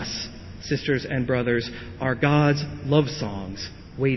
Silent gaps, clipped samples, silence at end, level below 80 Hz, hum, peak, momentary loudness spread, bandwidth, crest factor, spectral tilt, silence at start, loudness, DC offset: none; under 0.1%; 0 s; -46 dBFS; none; -6 dBFS; 14 LU; 6.2 kHz; 18 dB; -6.5 dB/octave; 0 s; -24 LUFS; under 0.1%